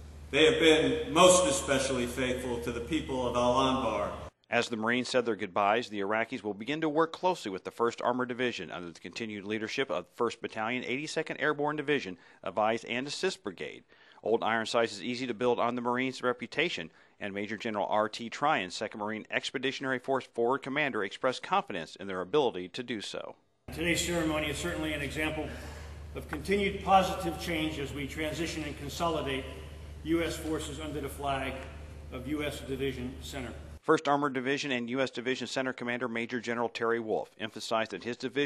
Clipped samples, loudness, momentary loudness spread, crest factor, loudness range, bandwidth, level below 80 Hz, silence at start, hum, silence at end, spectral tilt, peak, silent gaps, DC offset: under 0.1%; -31 LUFS; 12 LU; 24 dB; 4 LU; 13 kHz; -52 dBFS; 0 s; none; 0 s; -4 dB/octave; -8 dBFS; none; under 0.1%